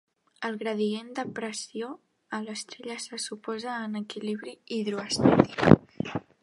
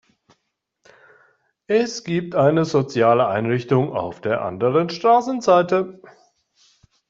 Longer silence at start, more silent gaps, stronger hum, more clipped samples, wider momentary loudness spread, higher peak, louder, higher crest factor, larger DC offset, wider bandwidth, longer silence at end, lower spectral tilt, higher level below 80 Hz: second, 0.4 s vs 1.7 s; neither; neither; neither; first, 16 LU vs 7 LU; about the same, 0 dBFS vs -2 dBFS; second, -28 LUFS vs -19 LUFS; first, 28 dB vs 18 dB; neither; first, 11.5 kHz vs 7.8 kHz; second, 0.25 s vs 1.15 s; about the same, -5.5 dB/octave vs -6.5 dB/octave; first, -54 dBFS vs -62 dBFS